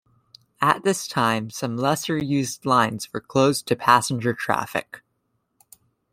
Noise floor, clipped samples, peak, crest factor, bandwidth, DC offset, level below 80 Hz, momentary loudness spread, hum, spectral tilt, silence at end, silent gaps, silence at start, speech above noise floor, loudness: -73 dBFS; under 0.1%; -2 dBFS; 22 dB; 16 kHz; under 0.1%; -62 dBFS; 9 LU; none; -4.5 dB/octave; 1.15 s; none; 0.6 s; 50 dB; -22 LUFS